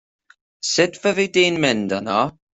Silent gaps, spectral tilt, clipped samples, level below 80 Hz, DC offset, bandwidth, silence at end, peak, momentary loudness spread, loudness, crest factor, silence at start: none; -3.5 dB/octave; under 0.1%; -60 dBFS; under 0.1%; 8.4 kHz; 0.25 s; -2 dBFS; 5 LU; -19 LUFS; 18 dB; 0.65 s